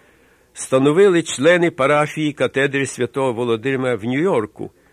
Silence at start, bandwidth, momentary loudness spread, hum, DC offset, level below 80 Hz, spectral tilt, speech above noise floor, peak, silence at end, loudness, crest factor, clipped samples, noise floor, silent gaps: 0.55 s; 13.5 kHz; 8 LU; none; under 0.1%; -58 dBFS; -5 dB/octave; 36 dB; -4 dBFS; 0.25 s; -17 LUFS; 14 dB; under 0.1%; -54 dBFS; none